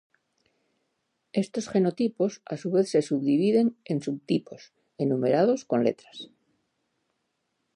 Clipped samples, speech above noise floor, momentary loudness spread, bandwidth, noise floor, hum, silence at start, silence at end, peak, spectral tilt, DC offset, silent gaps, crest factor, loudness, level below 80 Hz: under 0.1%; 52 dB; 10 LU; 11 kHz; -78 dBFS; none; 1.35 s; 1.5 s; -10 dBFS; -7 dB/octave; under 0.1%; none; 18 dB; -26 LUFS; -76 dBFS